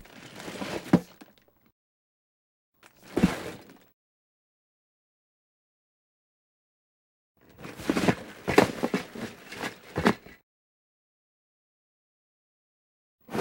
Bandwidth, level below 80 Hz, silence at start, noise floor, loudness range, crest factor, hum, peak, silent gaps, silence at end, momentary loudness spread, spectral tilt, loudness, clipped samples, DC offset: 16.5 kHz; -56 dBFS; 0.15 s; -58 dBFS; 7 LU; 30 dB; none; -2 dBFS; 1.72-2.72 s, 3.93-7.35 s, 10.43-13.18 s; 0 s; 19 LU; -5.5 dB/octave; -29 LUFS; under 0.1%; under 0.1%